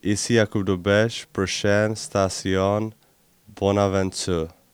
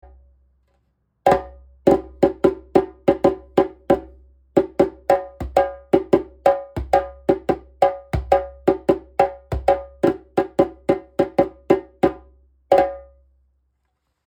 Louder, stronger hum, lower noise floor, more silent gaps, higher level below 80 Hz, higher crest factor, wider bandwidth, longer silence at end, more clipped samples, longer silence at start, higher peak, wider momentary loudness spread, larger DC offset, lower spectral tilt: about the same, -22 LUFS vs -21 LUFS; neither; second, -59 dBFS vs -72 dBFS; neither; second, -52 dBFS vs -40 dBFS; about the same, 18 dB vs 20 dB; about the same, 19 kHz vs 18.5 kHz; second, 0.25 s vs 1.25 s; neither; second, 0.05 s vs 1.25 s; about the same, -4 dBFS vs -2 dBFS; about the same, 6 LU vs 4 LU; neither; second, -5 dB/octave vs -7.5 dB/octave